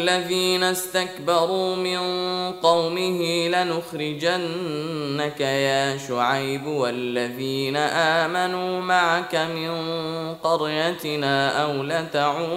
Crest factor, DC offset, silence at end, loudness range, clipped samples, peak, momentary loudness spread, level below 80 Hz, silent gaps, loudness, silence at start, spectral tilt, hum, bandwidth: 18 dB; under 0.1%; 0 s; 2 LU; under 0.1%; -6 dBFS; 7 LU; -66 dBFS; none; -23 LUFS; 0 s; -4 dB/octave; none; 16 kHz